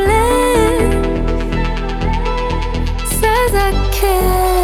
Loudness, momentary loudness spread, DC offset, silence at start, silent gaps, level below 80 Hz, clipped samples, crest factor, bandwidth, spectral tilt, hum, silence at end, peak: -15 LUFS; 7 LU; under 0.1%; 0 s; none; -18 dBFS; under 0.1%; 14 dB; 17.5 kHz; -5 dB/octave; none; 0 s; 0 dBFS